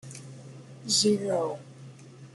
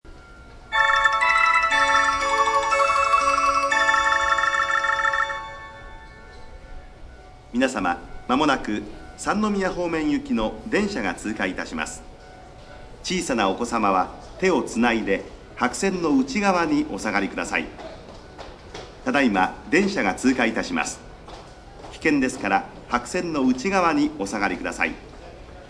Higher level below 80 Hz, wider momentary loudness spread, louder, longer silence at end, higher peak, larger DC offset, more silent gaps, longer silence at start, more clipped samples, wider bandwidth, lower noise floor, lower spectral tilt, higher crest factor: second, -72 dBFS vs -46 dBFS; first, 25 LU vs 21 LU; second, -26 LUFS vs -22 LUFS; about the same, 0.1 s vs 0 s; second, -12 dBFS vs -6 dBFS; neither; neither; about the same, 0.05 s vs 0.05 s; neither; about the same, 12 kHz vs 11 kHz; first, -48 dBFS vs -44 dBFS; about the same, -3.5 dB/octave vs -4 dB/octave; about the same, 18 dB vs 18 dB